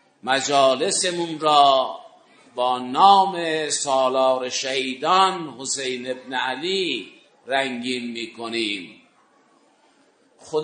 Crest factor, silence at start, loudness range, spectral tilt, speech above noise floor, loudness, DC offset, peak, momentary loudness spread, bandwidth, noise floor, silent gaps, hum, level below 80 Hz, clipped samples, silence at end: 20 dB; 0.25 s; 9 LU; -2 dB/octave; 38 dB; -21 LUFS; under 0.1%; -2 dBFS; 14 LU; 9.6 kHz; -59 dBFS; none; none; -78 dBFS; under 0.1%; 0 s